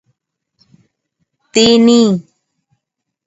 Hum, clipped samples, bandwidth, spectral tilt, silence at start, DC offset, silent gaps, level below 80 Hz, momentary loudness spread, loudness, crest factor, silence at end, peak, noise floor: none; under 0.1%; 8 kHz; -4.5 dB/octave; 1.55 s; under 0.1%; none; -54 dBFS; 10 LU; -11 LUFS; 16 dB; 1.05 s; 0 dBFS; -77 dBFS